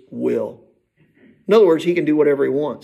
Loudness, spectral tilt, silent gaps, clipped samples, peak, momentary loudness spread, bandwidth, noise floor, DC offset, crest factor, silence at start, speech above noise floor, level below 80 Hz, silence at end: -17 LUFS; -7 dB/octave; none; under 0.1%; -2 dBFS; 12 LU; 12.5 kHz; -59 dBFS; under 0.1%; 16 dB; 0.1 s; 42 dB; -68 dBFS; 0.05 s